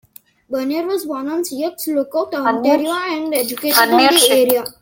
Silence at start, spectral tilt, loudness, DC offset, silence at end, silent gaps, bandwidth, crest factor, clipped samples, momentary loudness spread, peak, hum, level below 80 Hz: 0.5 s; -1.5 dB/octave; -16 LUFS; under 0.1%; 0.1 s; none; 17 kHz; 16 dB; under 0.1%; 12 LU; 0 dBFS; none; -62 dBFS